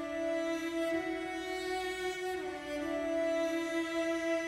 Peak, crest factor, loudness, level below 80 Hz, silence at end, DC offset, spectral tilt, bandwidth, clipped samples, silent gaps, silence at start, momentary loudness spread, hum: -22 dBFS; 12 dB; -35 LUFS; -64 dBFS; 0 s; under 0.1%; -3.5 dB/octave; 15.5 kHz; under 0.1%; none; 0 s; 5 LU; none